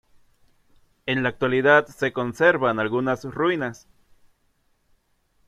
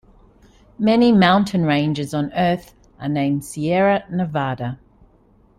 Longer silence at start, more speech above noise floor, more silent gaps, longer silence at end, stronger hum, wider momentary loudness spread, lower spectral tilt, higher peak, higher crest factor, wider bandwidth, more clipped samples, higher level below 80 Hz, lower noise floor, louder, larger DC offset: first, 1.05 s vs 0.8 s; first, 45 dB vs 36 dB; neither; first, 1.75 s vs 0.85 s; neither; second, 9 LU vs 13 LU; about the same, -6 dB/octave vs -6.5 dB/octave; about the same, -4 dBFS vs -2 dBFS; about the same, 20 dB vs 16 dB; about the same, 13.5 kHz vs 14.5 kHz; neither; second, -60 dBFS vs -52 dBFS; first, -67 dBFS vs -54 dBFS; second, -22 LUFS vs -19 LUFS; neither